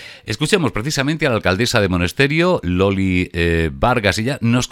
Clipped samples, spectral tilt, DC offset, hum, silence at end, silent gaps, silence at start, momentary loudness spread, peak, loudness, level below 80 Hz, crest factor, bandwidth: under 0.1%; -5 dB/octave; under 0.1%; none; 0.05 s; none; 0 s; 3 LU; 0 dBFS; -17 LUFS; -36 dBFS; 18 dB; 16.5 kHz